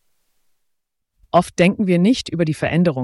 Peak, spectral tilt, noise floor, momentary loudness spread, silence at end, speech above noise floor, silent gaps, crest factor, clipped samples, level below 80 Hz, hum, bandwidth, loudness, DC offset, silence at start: -2 dBFS; -6.5 dB/octave; -74 dBFS; 4 LU; 0 s; 57 dB; none; 16 dB; under 0.1%; -50 dBFS; none; 12 kHz; -18 LUFS; under 0.1%; 1.35 s